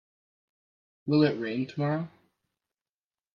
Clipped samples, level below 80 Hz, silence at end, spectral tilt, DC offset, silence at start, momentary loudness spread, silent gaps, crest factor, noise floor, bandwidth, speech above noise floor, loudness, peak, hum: under 0.1%; -72 dBFS; 1.25 s; -9 dB/octave; under 0.1%; 1.05 s; 14 LU; none; 20 dB; under -90 dBFS; 6.8 kHz; over 63 dB; -28 LUFS; -12 dBFS; none